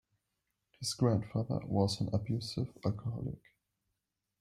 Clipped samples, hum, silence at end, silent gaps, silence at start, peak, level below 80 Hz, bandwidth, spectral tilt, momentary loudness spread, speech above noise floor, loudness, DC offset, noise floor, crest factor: under 0.1%; none; 1.05 s; none; 0.8 s; -16 dBFS; -62 dBFS; 13.5 kHz; -6.5 dB/octave; 9 LU; 53 dB; -35 LUFS; under 0.1%; -87 dBFS; 20 dB